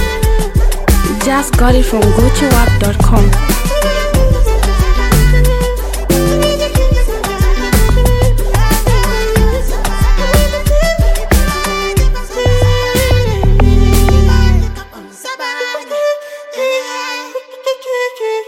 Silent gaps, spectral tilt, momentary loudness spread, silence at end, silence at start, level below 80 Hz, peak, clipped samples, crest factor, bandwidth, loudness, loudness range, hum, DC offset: none; -5 dB/octave; 9 LU; 0.05 s; 0 s; -12 dBFS; 0 dBFS; under 0.1%; 10 dB; 17 kHz; -13 LUFS; 3 LU; none; under 0.1%